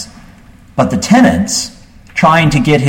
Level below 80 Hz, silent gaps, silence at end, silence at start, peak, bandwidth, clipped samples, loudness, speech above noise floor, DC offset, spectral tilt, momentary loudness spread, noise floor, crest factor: -36 dBFS; none; 0 s; 0 s; 0 dBFS; 16.5 kHz; under 0.1%; -11 LUFS; 29 dB; under 0.1%; -5 dB/octave; 15 LU; -39 dBFS; 12 dB